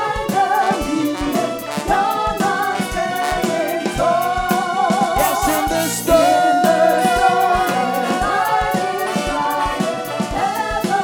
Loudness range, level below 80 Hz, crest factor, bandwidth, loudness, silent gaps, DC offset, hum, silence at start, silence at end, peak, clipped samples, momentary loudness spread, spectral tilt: 4 LU; -36 dBFS; 14 dB; 19.5 kHz; -17 LUFS; none; under 0.1%; none; 0 s; 0 s; -2 dBFS; under 0.1%; 6 LU; -4 dB/octave